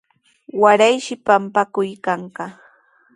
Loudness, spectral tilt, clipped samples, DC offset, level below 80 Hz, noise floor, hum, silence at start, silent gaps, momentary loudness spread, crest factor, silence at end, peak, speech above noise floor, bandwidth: -17 LUFS; -4 dB/octave; under 0.1%; under 0.1%; -66 dBFS; -54 dBFS; none; 0.55 s; none; 18 LU; 18 dB; 0.65 s; 0 dBFS; 37 dB; 11.5 kHz